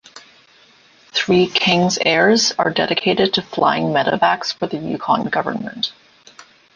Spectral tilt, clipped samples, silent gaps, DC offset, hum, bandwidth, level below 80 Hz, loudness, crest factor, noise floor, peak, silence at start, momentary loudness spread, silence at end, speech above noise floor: -4 dB/octave; under 0.1%; none; under 0.1%; none; 10 kHz; -56 dBFS; -17 LUFS; 16 dB; -51 dBFS; -2 dBFS; 0.15 s; 10 LU; 0.35 s; 33 dB